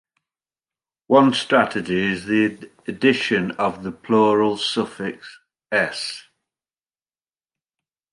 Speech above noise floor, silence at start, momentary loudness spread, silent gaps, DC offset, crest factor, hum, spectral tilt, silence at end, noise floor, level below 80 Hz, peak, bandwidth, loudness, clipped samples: over 70 dB; 1.1 s; 14 LU; none; under 0.1%; 20 dB; none; -5 dB/octave; 1.9 s; under -90 dBFS; -60 dBFS; -2 dBFS; 11.5 kHz; -20 LUFS; under 0.1%